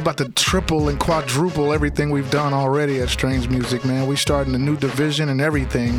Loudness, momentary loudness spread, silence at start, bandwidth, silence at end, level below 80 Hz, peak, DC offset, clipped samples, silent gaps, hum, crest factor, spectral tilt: -20 LUFS; 2 LU; 0 s; 17.5 kHz; 0 s; -32 dBFS; -4 dBFS; under 0.1%; under 0.1%; none; none; 16 dB; -5 dB/octave